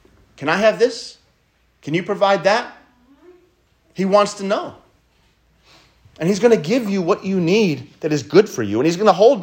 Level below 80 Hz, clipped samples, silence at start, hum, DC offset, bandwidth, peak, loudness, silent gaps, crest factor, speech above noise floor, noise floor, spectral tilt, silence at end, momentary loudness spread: -62 dBFS; under 0.1%; 0.4 s; none; under 0.1%; 16 kHz; 0 dBFS; -18 LUFS; none; 18 dB; 44 dB; -61 dBFS; -5.5 dB/octave; 0 s; 11 LU